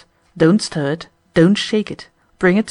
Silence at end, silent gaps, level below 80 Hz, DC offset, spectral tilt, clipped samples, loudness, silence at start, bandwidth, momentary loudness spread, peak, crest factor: 0 s; none; -50 dBFS; under 0.1%; -6 dB/octave; under 0.1%; -17 LUFS; 0.35 s; 11 kHz; 13 LU; -2 dBFS; 16 dB